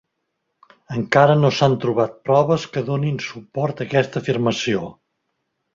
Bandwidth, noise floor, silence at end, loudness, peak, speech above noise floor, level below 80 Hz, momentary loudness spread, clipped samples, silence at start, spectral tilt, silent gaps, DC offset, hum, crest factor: 7.6 kHz; -75 dBFS; 0.8 s; -19 LUFS; -2 dBFS; 56 dB; -56 dBFS; 12 LU; under 0.1%; 0.9 s; -6.5 dB/octave; none; under 0.1%; none; 18 dB